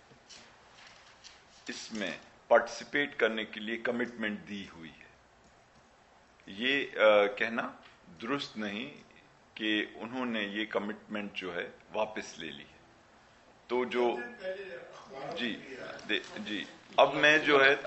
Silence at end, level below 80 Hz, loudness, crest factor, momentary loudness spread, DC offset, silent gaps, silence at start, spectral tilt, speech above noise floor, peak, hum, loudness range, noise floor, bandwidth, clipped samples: 0 s; -72 dBFS; -31 LUFS; 24 dB; 23 LU; under 0.1%; none; 0.3 s; -4 dB/octave; 30 dB; -8 dBFS; none; 6 LU; -62 dBFS; 8.2 kHz; under 0.1%